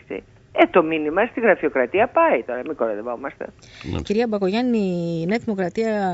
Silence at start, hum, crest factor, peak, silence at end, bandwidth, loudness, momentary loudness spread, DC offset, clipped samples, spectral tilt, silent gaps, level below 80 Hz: 0.1 s; none; 20 dB; 0 dBFS; 0 s; 8 kHz; -21 LUFS; 14 LU; under 0.1%; under 0.1%; -7 dB/octave; none; -50 dBFS